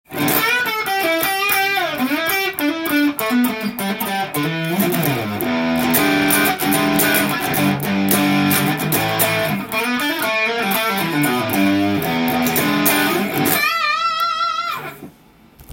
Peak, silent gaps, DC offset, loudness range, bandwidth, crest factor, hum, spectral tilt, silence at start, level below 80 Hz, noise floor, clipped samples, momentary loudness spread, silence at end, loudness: 0 dBFS; none; under 0.1%; 3 LU; 17 kHz; 18 dB; none; -3.5 dB/octave; 0.1 s; -54 dBFS; -48 dBFS; under 0.1%; 6 LU; 0 s; -17 LUFS